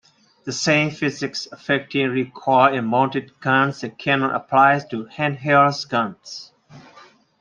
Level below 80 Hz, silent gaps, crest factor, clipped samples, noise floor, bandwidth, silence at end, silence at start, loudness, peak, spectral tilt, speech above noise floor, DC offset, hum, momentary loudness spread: -64 dBFS; none; 18 dB; under 0.1%; -50 dBFS; 9.4 kHz; 0.6 s; 0.45 s; -20 LUFS; -2 dBFS; -5 dB/octave; 30 dB; under 0.1%; none; 13 LU